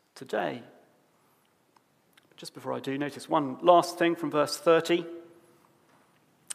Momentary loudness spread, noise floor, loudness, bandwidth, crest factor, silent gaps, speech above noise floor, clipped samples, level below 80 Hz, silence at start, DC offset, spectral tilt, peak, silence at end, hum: 21 LU; -67 dBFS; -27 LUFS; 15.5 kHz; 24 dB; none; 40 dB; under 0.1%; -84 dBFS; 0.15 s; under 0.1%; -4.5 dB/octave; -6 dBFS; 1.3 s; none